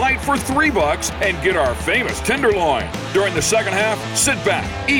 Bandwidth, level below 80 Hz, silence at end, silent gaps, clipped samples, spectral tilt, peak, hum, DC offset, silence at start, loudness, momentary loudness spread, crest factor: 17.5 kHz; -34 dBFS; 0 s; none; under 0.1%; -3.5 dB/octave; -6 dBFS; none; under 0.1%; 0 s; -18 LUFS; 3 LU; 12 dB